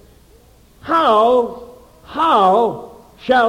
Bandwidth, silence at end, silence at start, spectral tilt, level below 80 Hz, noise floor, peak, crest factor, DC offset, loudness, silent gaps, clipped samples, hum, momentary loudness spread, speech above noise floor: 15.5 kHz; 0 s; 0.85 s; -5.5 dB/octave; -50 dBFS; -48 dBFS; -2 dBFS; 14 dB; under 0.1%; -15 LUFS; none; under 0.1%; none; 20 LU; 34 dB